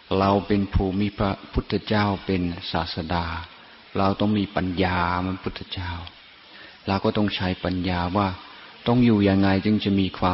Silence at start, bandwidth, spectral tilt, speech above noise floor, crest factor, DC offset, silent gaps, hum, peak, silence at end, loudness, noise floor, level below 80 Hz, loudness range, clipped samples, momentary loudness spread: 0.1 s; 5.8 kHz; -11 dB/octave; 24 dB; 16 dB; under 0.1%; none; none; -8 dBFS; 0 s; -24 LUFS; -47 dBFS; -40 dBFS; 4 LU; under 0.1%; 13 LU